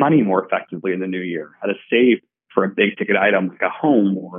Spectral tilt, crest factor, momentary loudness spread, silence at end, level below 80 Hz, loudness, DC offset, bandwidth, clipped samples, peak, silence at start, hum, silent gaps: -4.5 dB/octave; 16 dB; 10 LU; 0 s; -72 dBFS; -19 LUFS; under 0.1%; 3.7 kHz; under 0.1%; -2 dBFS; 0 s; none; none